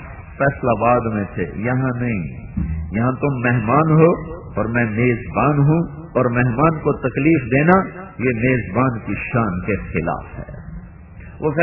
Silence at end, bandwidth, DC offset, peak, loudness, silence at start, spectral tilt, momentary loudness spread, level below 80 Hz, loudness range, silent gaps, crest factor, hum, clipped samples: 0 s; 3 kHz; under 0.1%; 0 dBFS; -19 LUFS; 0 s; -12.5 dB/octave; 13 LU; -36 dBFS; 4 LU; none; 18 dB; none; under 0.1%